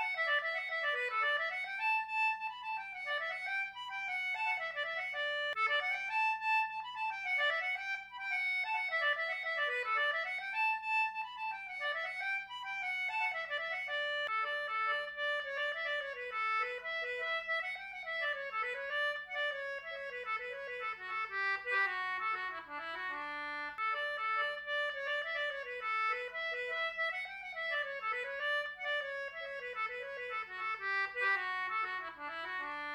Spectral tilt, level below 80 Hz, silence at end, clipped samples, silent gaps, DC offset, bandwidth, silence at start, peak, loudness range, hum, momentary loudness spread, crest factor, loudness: -1 dB/octave; -78 dBFS; 0 s; under 0.1%; none; under 0.1%; 16.5 kHz; 0 s; -22 dBFS; 3 LU; none; 8 LU; 14 dB; -35 LUFS